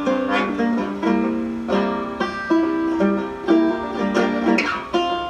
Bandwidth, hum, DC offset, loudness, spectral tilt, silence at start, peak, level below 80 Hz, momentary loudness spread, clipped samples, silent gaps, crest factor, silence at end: 9.2 kHz; none; under 0.1%; -21 LUFS; -6 dB/octave; 0 s; -4 dBFS; -48 dBFS; 5 LU; under 0.1%; none; 16 dB; 0 s